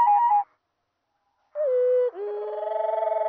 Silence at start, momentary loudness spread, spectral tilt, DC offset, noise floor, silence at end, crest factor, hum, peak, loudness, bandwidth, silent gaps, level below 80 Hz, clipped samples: 0 s; 11 LU; 0.5 dB/octave; under 0.1%; -77 dBFS; 0 s; 12 dB; none; -12 dBFS; -24 LUFS; 3.7 kHz; none; -88 dBFS; under 0.1%